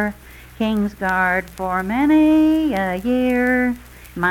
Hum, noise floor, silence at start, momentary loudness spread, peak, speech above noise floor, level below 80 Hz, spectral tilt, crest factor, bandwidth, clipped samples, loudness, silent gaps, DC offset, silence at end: none; -39 dBFS; 0 s; 10 LU; -6 dBFS; 21 dB; -42 dBFS; -6.5 dB/octave; 12 dB; 16.5 kHz; under 0.1%; -18 LUFS; none; under 0.1%; 0 s